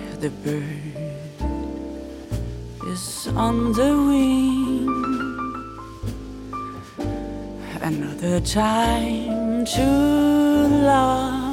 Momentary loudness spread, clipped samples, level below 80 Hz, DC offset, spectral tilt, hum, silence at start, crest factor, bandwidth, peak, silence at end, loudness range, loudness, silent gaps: 16 LU; under 0.1%; -36 dBFS; under 0.1%; -5.5 dB/octave; none; 0 s; 16 dB; 16 kHz; -6 dBFS; 0 s; 10 LU; -22 LUFS; none